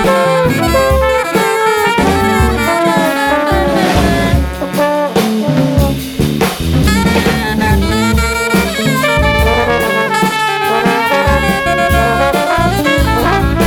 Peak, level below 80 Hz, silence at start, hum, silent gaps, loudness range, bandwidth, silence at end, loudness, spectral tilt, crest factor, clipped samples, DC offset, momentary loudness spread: 0 dBFS; -22 dBFS; 0 s; none; none; 1 LU; 20 kHz; 0 s; -12 LUFS; -5 dB/octave; 10 dB; under 0.1%; under 0.1%; 2 LU